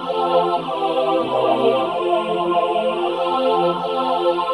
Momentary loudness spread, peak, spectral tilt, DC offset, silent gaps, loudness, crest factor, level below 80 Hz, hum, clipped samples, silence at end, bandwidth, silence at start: 3 LU; -4 dBFS; -6 dB/octave; under 0.1%; none; -19 LUFS; 14 dB; -64 dBFS; none; under 0.1%; 0 s; 11.5 kHz; 0 s